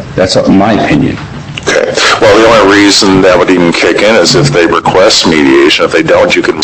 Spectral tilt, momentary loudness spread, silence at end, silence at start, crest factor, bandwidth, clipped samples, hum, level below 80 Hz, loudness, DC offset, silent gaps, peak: -4 dB/octave; 6 LU; 0 s; 0 s; 6 dB; 16.5 kHz; 2%; none; -32 dBFS; -5 LUFS; 0.3%; none; 0 dBFS